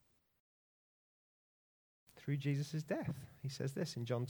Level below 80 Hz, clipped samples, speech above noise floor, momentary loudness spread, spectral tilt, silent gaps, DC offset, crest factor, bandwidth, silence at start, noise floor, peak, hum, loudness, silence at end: -74 dBFS; under 0.1%; over 50 dB; 8 LU; -6.5 dB/octave; none; under 0.1%; 18 dB; over 20 kHz; 2.15 s; under -90 dBFS; -26 dBFS; none; -42 LUFS; 0 s